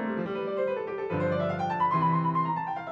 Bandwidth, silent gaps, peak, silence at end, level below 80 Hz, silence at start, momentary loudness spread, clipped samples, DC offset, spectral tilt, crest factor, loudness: 7 kHz; none; -16 dBFS; 0 s; -68 dBFS; 0 s; 6 LU; under 0.1%; under 0.1%; -8.5 dB/octave; 12 dB; -28 LUFS